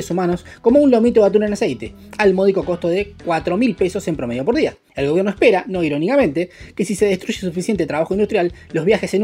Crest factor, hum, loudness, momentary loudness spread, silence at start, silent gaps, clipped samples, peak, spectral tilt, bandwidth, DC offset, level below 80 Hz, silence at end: 16 dB; none; -18 LUFS; 9 LU; 0 s; none; under 0.1%; -2 dBFS; -6 dB/octave; 15.5 kHz; under 0.1%; -46 dBFS; 0 s